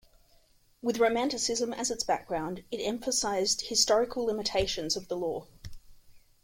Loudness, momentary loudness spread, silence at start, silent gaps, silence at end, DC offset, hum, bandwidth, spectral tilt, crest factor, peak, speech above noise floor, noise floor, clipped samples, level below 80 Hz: -29 LUFS; 10 LU; 0.85 s; none; 0.25 s; under 0.1%; none; 16.5 kHz; -2 dB/octave; 20 dB; -10 dBFS; 34 dB; -63 dBFS; under 0.1%; -54 dBFS